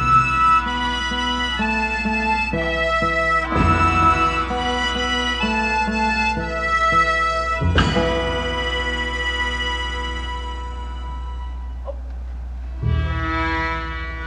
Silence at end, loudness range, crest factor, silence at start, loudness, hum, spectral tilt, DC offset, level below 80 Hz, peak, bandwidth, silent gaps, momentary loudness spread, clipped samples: 0 s; 8 LU; 16 dB; 0 s; -19 LUFS; none; -5 dB/octave; under 0.1%; -28 dBFS; -4 dBFS; 9.8 kHz; none; 15 LU; under 0.1%